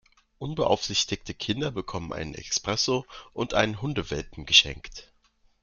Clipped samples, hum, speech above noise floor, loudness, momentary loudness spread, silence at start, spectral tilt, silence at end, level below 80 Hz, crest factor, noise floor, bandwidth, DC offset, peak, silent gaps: under 0.1%; none; 37 dB; -26 LUFS; 17 LU; 0.4 s; -3 dB/octave; 0.6 s; -50 dBFS; 26 dB; -65 dBFS; 12 kHz; under 0.1%; -2 dBFS; none